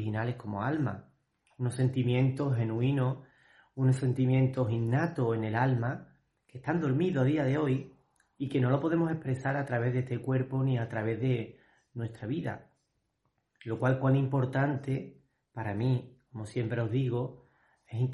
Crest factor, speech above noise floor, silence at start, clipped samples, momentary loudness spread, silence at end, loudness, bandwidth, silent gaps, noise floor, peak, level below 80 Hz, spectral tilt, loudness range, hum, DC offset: 16 dB; 49 dB; 0 s; under 0.1%; 13 LU; 0 s; -31 LUFS; 11 kHz; none; -78 dBFS; -14 dBFS; -64 dBFS; -8.5 dB/octave; 4 LU; none; under 0.1%